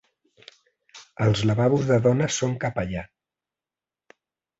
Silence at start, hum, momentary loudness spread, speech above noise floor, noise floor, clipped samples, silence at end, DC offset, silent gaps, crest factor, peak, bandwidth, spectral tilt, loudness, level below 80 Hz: 0.95 s; none; 11 LU; over 68 dB; under -90 dBFS; under 0.1%; 1.55 s; under 0.1%; none; 18 dB; -8 dBFS; 8 kHz; -6 dB/octave; -23 LUFS; -52 dBFS